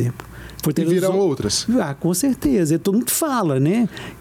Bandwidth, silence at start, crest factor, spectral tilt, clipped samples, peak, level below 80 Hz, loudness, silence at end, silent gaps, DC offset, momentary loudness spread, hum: 18.5 kHz; 0 s; 10 dB; -5 dB/octave; under 0.1%; -8 dBFS; -46 dBFS; -19 LUFS; 0 s; none; under 0.1%; 7 LU; none